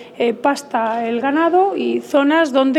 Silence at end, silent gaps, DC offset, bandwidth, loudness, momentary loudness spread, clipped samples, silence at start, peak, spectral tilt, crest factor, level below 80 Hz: 0 s; none; under 0.1%; 14 kHz; -17 LUFS; 6 LU; under 0.1%; 0 s; -2 dBFS; -4 dB/octave; 14 dB; -72 dBFS